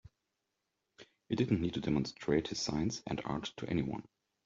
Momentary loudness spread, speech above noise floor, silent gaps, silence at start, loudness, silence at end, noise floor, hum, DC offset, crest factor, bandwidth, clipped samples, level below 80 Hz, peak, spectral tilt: 7 LU; 51 dB; none; 1 s; -36 LUFS; 0.45 s; -86 dBFS; none; under 0.1%; 20 dB; 8 kHz; under 0.1%; -60 dBFS; -16 dBFS; -5.5 dB/octave